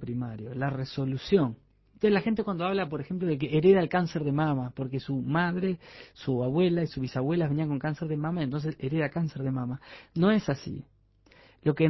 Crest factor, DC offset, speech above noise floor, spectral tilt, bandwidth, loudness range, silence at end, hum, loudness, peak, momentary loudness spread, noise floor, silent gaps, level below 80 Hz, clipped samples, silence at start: 18 dB; under 0.1%; 32 dB; -8.5 dB/octave; 6 kHz; 4 LU; 0 s; none; -29 LUFS; -10 dBFS; 10 LU; -60 dBFS; none; -58 dBFS; under 0.1%; 0 s